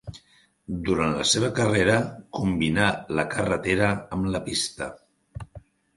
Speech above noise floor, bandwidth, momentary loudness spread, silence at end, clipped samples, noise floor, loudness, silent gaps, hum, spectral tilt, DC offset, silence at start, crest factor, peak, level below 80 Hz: 35 dB; 11.5 kHz; 20 LU; 0.35 s; under 0.1%; -59 dBFS; -24 LUFS; none; none; -4.5 dB/octave; under 0.1%; 0.05 s; 22 dB; -4 dBFS; -46 dBFS